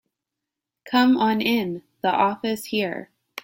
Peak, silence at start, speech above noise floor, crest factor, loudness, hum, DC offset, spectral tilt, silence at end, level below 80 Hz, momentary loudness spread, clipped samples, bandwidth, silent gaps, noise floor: -8 dBFS; 0.85 s; 64 dB; 16 dB; -22 LUFS; none; under 0.1%; -5 dB/octave; 0.05 s; -66 dBFS; 12 LU; under 0.1%; 16.5 kHz; none; -85 dBFS